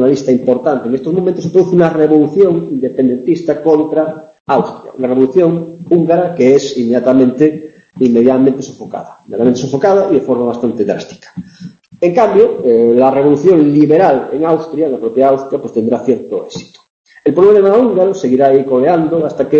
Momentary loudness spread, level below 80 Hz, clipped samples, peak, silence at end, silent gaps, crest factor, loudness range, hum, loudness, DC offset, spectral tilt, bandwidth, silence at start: 12 LU; -54 dBFS; under 0.1%; 0 dBFS; 0 s; 4.40-4.45 s, 16.90-17.04 s; 12 dB; 4 LU; none; -12 LUFS; under 0.1%; -7.5 dB/octave; 7.4 kHz; 0 s